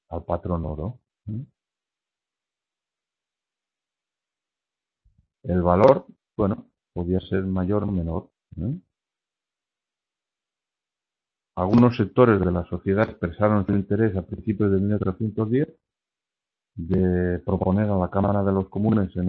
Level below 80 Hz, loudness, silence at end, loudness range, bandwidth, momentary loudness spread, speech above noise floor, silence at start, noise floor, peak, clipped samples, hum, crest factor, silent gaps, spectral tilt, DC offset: -46 dBFS; -23 LUFS; 0 s; 15 LU; 6 kHz; 17 LU; 68 dB; 0.1 s; -90 dBFS; -2 dBFS; under 0.1%; none; 24 dB; none; -10.5 dB/octave; under 0.1%